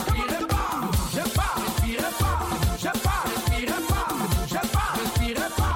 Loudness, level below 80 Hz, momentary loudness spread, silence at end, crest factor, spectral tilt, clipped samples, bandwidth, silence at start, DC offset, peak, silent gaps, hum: -25 LUFS; -30 dBFS; 1 LU; 0 s; 14 dB; -4.5 dB/octave; under 0.1%; 17 kHz; 0 s; under 0.1%; -10 dBFS; none; none